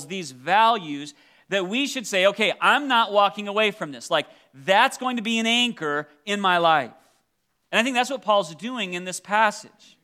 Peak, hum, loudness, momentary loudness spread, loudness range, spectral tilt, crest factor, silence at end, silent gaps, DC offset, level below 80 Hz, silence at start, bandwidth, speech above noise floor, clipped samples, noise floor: -4 dBFS; none; -22 LUFS; 13 LU; 2 LU; -3 dB/octave; 20 dB; 0.35 s; none; under 0.1%; -82 dBFS; 0 s; 15.5 kHz; 51 dB; under 0.1%; -73 dBFS